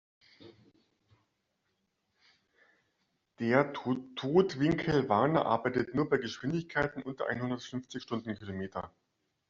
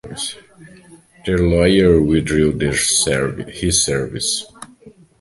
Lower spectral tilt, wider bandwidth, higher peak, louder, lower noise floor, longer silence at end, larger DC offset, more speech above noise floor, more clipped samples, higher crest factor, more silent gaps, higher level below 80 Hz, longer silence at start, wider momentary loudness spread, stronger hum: about the same, -5 dB/octave vs -4 dB/octave; second, 7.6 kHz vs 12 kHz; second, -10 dBFS vs 0 dBFS; second, -32 LUFS vs -16 LUFS; first, -80 dBFS vs -45 dBFS; first, 0.6 s vs 0.3 s; neither; first, 49 dB vs 29 dB; neither; first, 24 dB vs 18 dB; neither; second, -64 dBFS vs -34 dBFS; first, 0.4 s vs 0.05 s; about the same, 12 LU vs 13 LU; neither